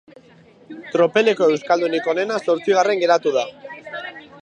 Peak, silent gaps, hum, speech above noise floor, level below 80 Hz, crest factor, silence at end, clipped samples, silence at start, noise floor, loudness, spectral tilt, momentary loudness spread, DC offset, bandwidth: -2 dBFS; none; none; 31 dB; -70 dBFS; 18 dB; 0.05 s; under 0.1%; 0.7 s; -49 dBFS; -18 LUFS; -4.5 dB/octave; 16 LU; under 0.1%; 9.2 kHz